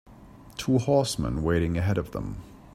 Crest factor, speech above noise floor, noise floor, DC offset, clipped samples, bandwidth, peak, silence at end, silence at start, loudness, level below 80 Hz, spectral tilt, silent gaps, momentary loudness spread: 18 dB; 23 dB; -49 dBFS; under 0.1%; under 0.1%; 15.5 kHz; -8 dBFS; 0.15 s; 0.1 s; -26 LUFS; -42 dBFS; -6 dB/octave; none; 15 LU